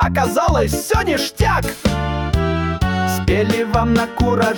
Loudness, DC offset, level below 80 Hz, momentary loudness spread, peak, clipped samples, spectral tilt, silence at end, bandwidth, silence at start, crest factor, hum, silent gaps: -18 LUFS; under 0.1%; -26 dBFS; 3 LU; -4 dBFS; under 0.1%; -5.5 dB/octave; 0 s; 19 kHz; 0 s; 12 dB; none; none